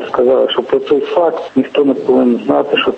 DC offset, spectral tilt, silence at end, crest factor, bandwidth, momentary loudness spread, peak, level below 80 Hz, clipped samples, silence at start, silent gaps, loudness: under 0.1%; -6.5 dB/octave; 0 s; 12 dB; 8 kHz; 3 LU; 0 dBFS; -54 dBFS; under 0.1%; 0 s; none; -13 LUFS